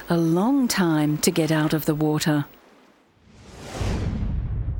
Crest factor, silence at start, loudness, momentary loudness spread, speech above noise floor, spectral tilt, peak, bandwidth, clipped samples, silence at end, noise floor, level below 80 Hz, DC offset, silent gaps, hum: 16 dB; 0 s; -22 LUFS; 9 LU; 35 dB; -5.5 dB/octave; -6 dBFS; over 20 kHz; under 0.1%; 0 s; -56 dBFS; -36 dBFS; under 0.1%; none; none